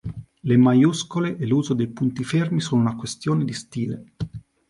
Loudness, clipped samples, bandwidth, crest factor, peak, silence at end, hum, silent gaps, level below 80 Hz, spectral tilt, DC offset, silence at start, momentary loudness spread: -22 LUFS; under 0.1%; 11.5 kHz; 16 dB; -6 dBFS; 0.3 s; none; none; -52 dBFS; -6.5 dB/octave; under 0.1%; 0.05 s; 16 LU